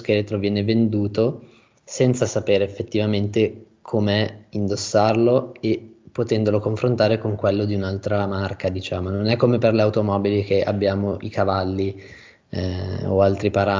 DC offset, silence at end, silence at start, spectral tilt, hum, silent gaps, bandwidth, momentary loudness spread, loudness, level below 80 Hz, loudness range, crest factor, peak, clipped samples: under 0.1%; 0 s; 0 s; -6.5 dB/octave; none; none; 7.6 kHz; 8 LU; -21 LUFS; -44 dBFS; 2 LU; 18 dB; -4 dBFS; under 0.1%